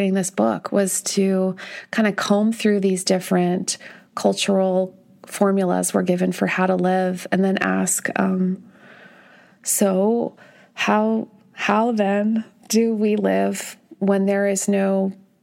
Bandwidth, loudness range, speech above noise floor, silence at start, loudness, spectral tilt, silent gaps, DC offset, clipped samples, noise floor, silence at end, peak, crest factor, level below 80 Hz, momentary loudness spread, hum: 16.5 kHz; 2 LU; 30 dB; 0 s; -20 LUFS; -5 dB/octave; none; under 0.1%; under 0.1%; -50 dBFS; 0.3 s; -4 dBFS; 18 dB; -74 dBFS; 8 LU; none